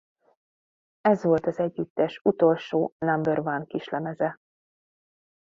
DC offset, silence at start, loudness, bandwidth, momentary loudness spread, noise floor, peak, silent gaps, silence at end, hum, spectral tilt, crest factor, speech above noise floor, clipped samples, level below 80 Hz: under 0.1%; 1.05 s; -26 LUFS; 7.2 kHz; 8 LU; under -90 dBFS; -8 dBFS; 1.90-1.96 s, 2.21-2.25 s, 2.92-3.00 s; 1.1 s; none; -8 dB/octave; 18 dB; over 65 dB; under 0.1%; -66 dBFS